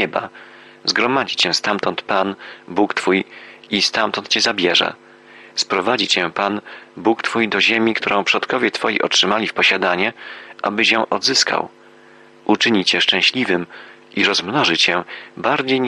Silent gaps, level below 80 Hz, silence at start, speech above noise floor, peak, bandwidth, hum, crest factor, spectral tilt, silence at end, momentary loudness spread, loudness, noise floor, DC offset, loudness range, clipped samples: none; -64 dBFS; 0 s; 28 dB; -2 dBFS; 11.5 kHz; none; 16 dB; -2.5 dB/octave; 0 s; 11 LU; -17 LUFS; -46 dBFS; under 0.1%; 2 LU; under 0.1%